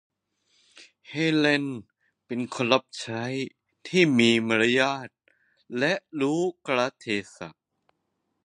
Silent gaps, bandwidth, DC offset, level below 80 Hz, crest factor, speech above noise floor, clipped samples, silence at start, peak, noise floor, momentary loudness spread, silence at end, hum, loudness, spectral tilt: none; 10.5 kHz; under 0.1%; -70 dBFS; 24 dB; 53 dB; under 0.1%; 0.8 s; -4 dBFS; -77 dBFS; 16 LU; 0.95 s; none; -25 LUFS; -5 dB/octave